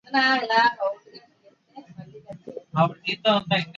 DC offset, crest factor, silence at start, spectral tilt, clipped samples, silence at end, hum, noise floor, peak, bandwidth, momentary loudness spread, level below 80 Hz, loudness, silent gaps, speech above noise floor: under 0.1%; 18 dB; 0.1 s; -5.5 dB/octave; under 0.1%; 0.05 s; none; -59 dBFS; -8 dBFS; 7.6 kHz; 23 LU; -68 dBFS; -22 LUFS; none; 37 dB